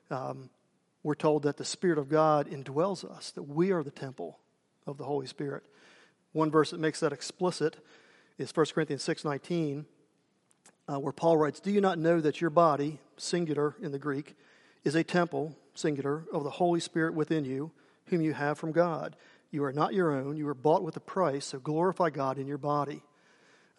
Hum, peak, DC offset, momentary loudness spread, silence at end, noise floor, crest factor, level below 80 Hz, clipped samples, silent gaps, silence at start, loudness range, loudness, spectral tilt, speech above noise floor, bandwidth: none; -10 dBFS; under 0.1%; 13 LU; 0.8 s; -71 dBFS; 20 dB; -80 dBFS; under 0.1%; none; 0.1 s; 5 LU; -31 LUFS; -6 dB/octave; 41 dB; 11.5 kHz